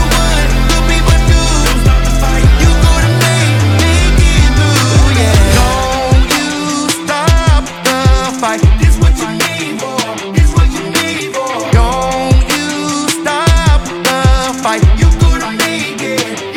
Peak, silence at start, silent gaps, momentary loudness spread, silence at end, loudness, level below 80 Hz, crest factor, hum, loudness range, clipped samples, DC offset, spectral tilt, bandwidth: 0 dBFS; 0 s; none; 6 LU; 0 s; -11 LUFS; -14 dBFS; 10 dB; none; 3 LU; under 0.1%; under 0.1%; -4.5 dB/octave; 17 kHz